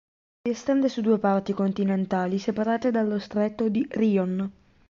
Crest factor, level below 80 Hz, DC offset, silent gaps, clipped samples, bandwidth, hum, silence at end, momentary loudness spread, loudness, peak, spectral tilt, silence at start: 14 dB; -62 dBFS; under 0.1%; none; under 0.1%; 7.4 kHz; none; 0.4 s; 6 LU; -25 LUFS; -10 dBFS; -7.5 dB/octave; 0.45 s